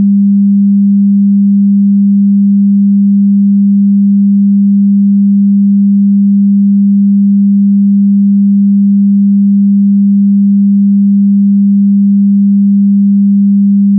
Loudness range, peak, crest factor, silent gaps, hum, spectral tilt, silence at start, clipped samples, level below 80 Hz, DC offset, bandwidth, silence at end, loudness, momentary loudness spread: 0 LU; -4 dBFS; 4 dB; none; none; -21.5 dB/octave; 0 s; under 0.1%; -74 dBFS; under 0.1%; 0.3 kHz; 0 s; -7 LUFS; 0 LU